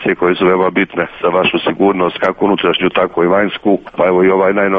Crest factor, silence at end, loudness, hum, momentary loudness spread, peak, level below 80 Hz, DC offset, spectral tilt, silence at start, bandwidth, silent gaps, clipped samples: 12 dB; 0 s; -13 LUFS; none; 4 LU; 0 dBFS; -48 dBFS; under 0.1%; -8 dB/octave; 0 s; 4.9 kHz; none; under 0.1%